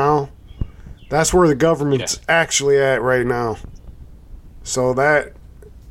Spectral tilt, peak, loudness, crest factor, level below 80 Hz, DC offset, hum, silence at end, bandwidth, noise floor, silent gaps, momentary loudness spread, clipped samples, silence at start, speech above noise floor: -4 dB/octave; -2 dBFS; -17 LUFS; 16 dB; -38 dBFS; under 0.1%; none; 0 s; 16.5 kHz; -40 dBFS; none; 17 LU; under 0.1%; 0 s; 24 dB